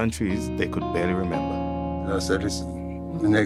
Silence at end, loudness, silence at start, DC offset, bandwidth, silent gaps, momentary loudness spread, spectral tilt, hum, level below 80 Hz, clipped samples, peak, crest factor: 0 s; -26 LUFS; 0 s; under 0.1%; 14 kHz; none; 6 LU; -6 dB/octave; none; -42 dBFS; under 0.1%; -10 dBFS; 16 dB